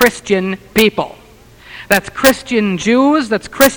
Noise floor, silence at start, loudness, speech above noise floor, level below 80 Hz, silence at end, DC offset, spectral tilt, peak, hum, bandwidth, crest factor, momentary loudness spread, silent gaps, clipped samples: -40 dBFS; 0 s; -14 LUFS; 27 dB; -42 dBFS; 0 s; under 0.1%; -4 dB/octave; 0 dBFS; none; over 20 kHz; 14 dB; 11 LU; none; 0.2%